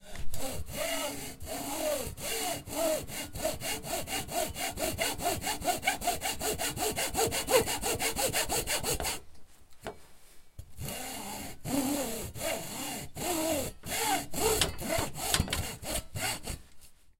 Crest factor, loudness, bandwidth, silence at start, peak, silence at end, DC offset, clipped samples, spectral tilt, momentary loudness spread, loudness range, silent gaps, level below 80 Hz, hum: 26 dB; -32 LUFS; 16.5 kHz; 0 s; -6 dBFS; 0 s; 0.2%; under 0.1%; -2.5 dB/octave; 10 LU; 6 LU; none; -48 dBFS; none